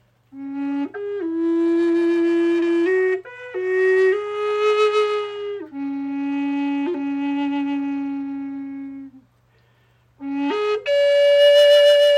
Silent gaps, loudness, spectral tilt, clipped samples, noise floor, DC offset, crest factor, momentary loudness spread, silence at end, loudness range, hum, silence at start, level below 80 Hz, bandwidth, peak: none; -19 LUFS; -3.5 dB/octave; under 0.1%; -59 dBFS; under 0.1%; 14 dB; 17 LU; 0 s; 8 LU; none; 0.35 s; -70 dBFS; 16 kHz; -4 dBFS